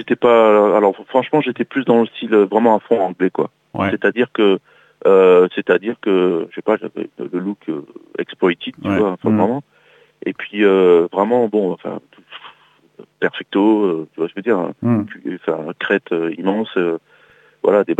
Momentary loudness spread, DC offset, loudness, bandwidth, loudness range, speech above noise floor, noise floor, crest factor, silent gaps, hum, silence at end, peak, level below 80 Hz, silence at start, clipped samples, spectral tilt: 15 LU; under 0.1%; -17 LUFS; 7.8 kHz; 5 LU; 35 dB; -51 dBFS; 16 dB; none; none; 0.05 s; 0 dBFS; -66 dBFS; 0 s; under 0.1%; -8 dB/octave